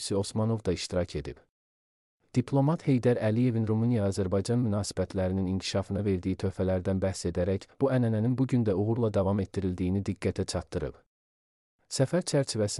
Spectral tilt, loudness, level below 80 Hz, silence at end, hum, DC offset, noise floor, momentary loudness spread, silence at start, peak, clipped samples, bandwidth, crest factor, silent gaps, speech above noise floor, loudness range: -6.5 dB/octave; -29 LUFS; -54 dBFS; 0 s; none; under 0.1%; under -90 dBFS; 6 LU; 0 s; -12 dBFS; under 0.1%; 12 kHz; 16 dB; 1.49-2.20 s, 11.06-11.79 s; over 62 dB; 4 LU